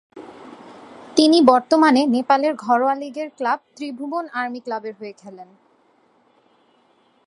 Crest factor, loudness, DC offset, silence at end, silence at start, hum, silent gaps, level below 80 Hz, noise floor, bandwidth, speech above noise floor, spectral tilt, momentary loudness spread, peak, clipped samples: 20 dB; -19 LUFS; under 0.1%; 1.8 s; 0.15 s; none; none; -72 dBFS; -59 dBFS; 11.5 kHz; 41 dB; -3.5 dB/octave; 23 LU; 0 dBFS; under 0.1%